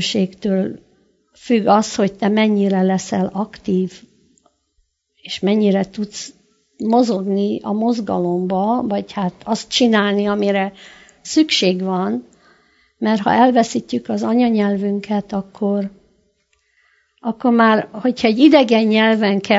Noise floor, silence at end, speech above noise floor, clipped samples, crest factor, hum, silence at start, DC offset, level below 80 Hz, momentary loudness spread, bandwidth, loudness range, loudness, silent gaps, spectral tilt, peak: -65 dBFS; 0 s; 49 dB; under 0.1%; 18 dB; none; 0 s; under 0.1%; -58 dBFS; 11 LU; 8 kHz; 4 LU; -17 LUFS; none; -5.5 dB/octave; 0 dBFS